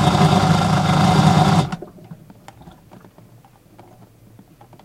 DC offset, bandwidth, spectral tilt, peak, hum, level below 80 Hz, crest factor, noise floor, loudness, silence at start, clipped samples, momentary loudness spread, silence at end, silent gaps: under 0.1%; 14 kHz; -6 dB/octave; -2 dBFS; none; -42 dBFS; 18 dB; -48 dBFS; -16 LUFS; 0 s; under 0.1%; 14 LU; 2.7 s; none